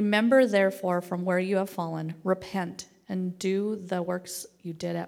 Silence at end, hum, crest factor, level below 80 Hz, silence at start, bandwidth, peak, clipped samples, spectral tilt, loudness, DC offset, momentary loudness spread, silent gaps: 0 s; none; 18 dB; -72 dBFS; 0 s; 17 kHz; -10 dBFS; under 0.1%; -5.5 dB/octave; -28 LUFS; under 0.1%; 15 LU; none